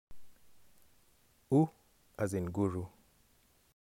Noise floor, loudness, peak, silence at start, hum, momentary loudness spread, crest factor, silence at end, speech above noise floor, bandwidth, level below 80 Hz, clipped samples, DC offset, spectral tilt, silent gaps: -69 dBFS; -34 LUFS; -18 dBFS; 0.1 s; none; 16 LU; 20 dB; 0.9 s; 37 dB; 16.5 kHz; -64 dBFS; under 0.1%; under 0.1%; -8.5 dB/octave; none